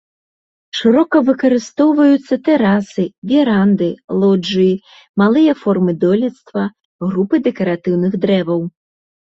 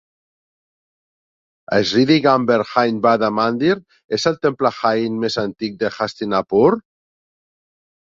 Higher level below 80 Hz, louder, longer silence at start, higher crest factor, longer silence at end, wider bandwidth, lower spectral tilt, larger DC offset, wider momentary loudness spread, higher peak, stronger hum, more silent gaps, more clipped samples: about the same, -56 dBFS vs -58 dBFS; first, -15 LUFS vs -18 LUFS; second, 0.75 s vs 1.7 s; second, 12 dB vs 18 dB; second, 0.7 s vs 1.3 s; about the same, 7.8 kHz vs 7.8 kHz; first, -7.5 dB/octave vs -5.5 dB/octave; neither; about the same, 10 LU vs 9 LU; about the same, -2 dBFS vs -2 dBFS; neither; first, 3.18-3.22 s, 4.04-4.08 s, 5.09-5.14 s, 6.85-6.99 s vs 4.04-4.09 s; neither